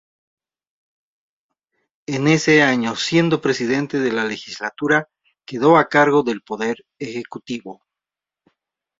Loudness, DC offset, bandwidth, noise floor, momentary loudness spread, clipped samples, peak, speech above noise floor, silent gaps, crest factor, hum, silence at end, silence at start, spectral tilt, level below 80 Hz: -18 LUFS; under 0.1%; 7.8 kHz; -88 dBFS; 16 LU; under 0.1%; 0 dBFS; 70 dB; none; 20 dB; none; 1.25 s; 2.1 s; -5 dB/octave; -62 dBFS